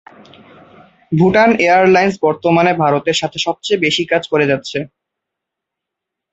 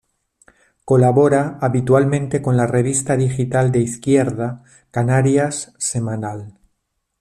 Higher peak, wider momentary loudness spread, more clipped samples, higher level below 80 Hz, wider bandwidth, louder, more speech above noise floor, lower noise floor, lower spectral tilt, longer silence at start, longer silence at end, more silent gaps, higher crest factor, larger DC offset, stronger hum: about the same, -2 dBFS vs -2 dBFS; about the same, 9 LU vs 11 LU; neither; about the same, -52 dBFS vs -52 dBFS; second, 8.2 kHz vs 12.5 kHz; first, -14 LUFS vs -17 LUFS; first, 67 dB vs 55 dB; first, -81 dBFS vs -72 dBFS; second, -5 dB/octave vs -6.5 dB/octave; first, 1.1 s vs 0.85 s; first, 1.45 s vs 0.7 s; neither; about the same, 14 dB vs 16 dB; neither; neither